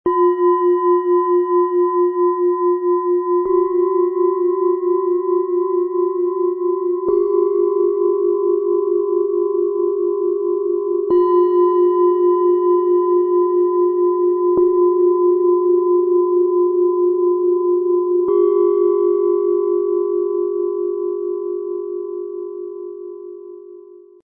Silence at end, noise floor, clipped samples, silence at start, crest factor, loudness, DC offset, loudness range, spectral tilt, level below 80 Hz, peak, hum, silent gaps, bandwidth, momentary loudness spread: 0.25 s; -41 dBFS; under 0.1%; 0.05 s; 10 dB; -17 LUFS; under 0.1%; 4 LU; -11.5 dB/octave; -62 dBFS; -6 dBFS; none; none; 2 kHz; 8 LU